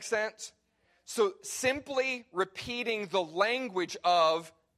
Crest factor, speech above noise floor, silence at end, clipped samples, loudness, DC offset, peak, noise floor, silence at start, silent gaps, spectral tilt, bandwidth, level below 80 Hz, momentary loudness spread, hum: 18 dB; 39 dB; 0.3 s; under 0.1%; -31 LUFS; under 0.1%; -12 dBFS; -69 dBFS; 0 s; none; -2.5 dB/octave; 15 kHz; -68 dBFS; 9 LU; none